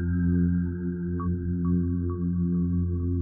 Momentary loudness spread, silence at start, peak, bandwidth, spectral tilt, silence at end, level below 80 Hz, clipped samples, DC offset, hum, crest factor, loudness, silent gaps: 5 LU; 0 s; -16 dBFS; 1.7 kHz; -10.5 dB/octave; 0 s; -40 dBFS; under 0.1%; under 0.1%; none; 10 dB; -27 LUFS; none